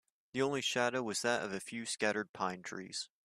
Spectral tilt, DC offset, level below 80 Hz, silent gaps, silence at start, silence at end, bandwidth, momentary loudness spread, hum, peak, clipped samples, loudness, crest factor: -3 dB/octave; under 0.1%; -78 dBFS; 2.29-2.34 s; 0.35 s; 0.2 s; 15.5 kHz; 9 LU; none; -16 dBFS; under 0.1%; -36 LUFS; 20 dB